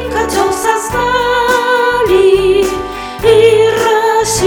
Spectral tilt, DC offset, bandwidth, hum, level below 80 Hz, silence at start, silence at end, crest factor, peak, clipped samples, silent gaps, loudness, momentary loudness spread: -3.5 dB/octave; under 0.1%; 18 kHz; none; -32 dBFS; 0 s; 0 s; 10 dB; 0 dBFS; under 0.1%; none; -11 LUFS; 6 LU